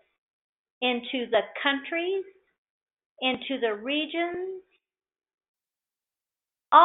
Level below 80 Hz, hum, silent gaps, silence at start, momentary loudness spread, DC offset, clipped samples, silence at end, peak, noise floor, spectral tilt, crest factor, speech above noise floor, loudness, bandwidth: -76 dBFS; none; 2.58-2.86 s, 2.93-2.97 s, 3.06-3.16 s, 5.34-5.38 s, 5.48-5.54 s; 0.8 s; 9 LU; under 0.1%; under 0.1%; 0 s; -4 dBFS; under -90 dBFS; 0.5 dB/octave; 24 dB; over 62 dB; -28 LUFS; 4.1 kHz